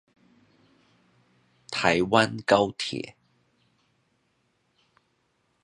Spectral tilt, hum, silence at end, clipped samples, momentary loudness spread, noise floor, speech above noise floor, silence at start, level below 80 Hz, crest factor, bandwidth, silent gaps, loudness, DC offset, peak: -4.5 dB/octave; none; 2.55 s; under 0.1%; 13 LU; -72 dBFS; 48 dB; 1.7 s; -62 dBFS; 26 dB; 11 kHz; none; -24 LUFS; under 0.1%; -2 dBFS